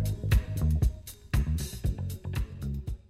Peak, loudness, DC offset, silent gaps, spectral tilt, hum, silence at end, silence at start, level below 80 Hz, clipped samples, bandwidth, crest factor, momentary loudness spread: -14 dBFS; -31 LUFS; under 0.1%; none; -6 dB/octave; none; 0.1 s; 0 s; -32 dBFS; under 0.1%; 15.5 kHz; 14 dB; 9 LU